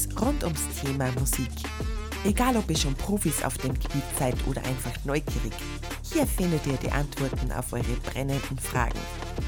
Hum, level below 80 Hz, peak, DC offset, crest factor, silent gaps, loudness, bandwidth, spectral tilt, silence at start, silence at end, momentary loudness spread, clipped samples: none; -34 dBFS; -10 dBFS; under 0.1%; 18 dB; none; -29 LUFS; over 20 kHz; -5 dB/octave; 0 s; 0 s; 7 LU; under 0.1%